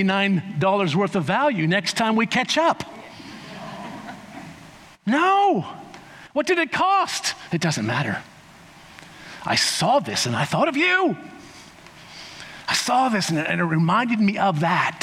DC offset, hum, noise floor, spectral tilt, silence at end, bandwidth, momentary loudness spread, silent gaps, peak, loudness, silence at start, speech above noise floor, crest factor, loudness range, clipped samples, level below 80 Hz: under 0.1%; none; -47 dBFS; -4.5 dB/octave; 0 s; 16 kHz; 20 LU; none; -6 dBFS; -21 LUFS; 0 s; 26 dB; 16 dB; 3 LU; under 0.1%; -64 dBFS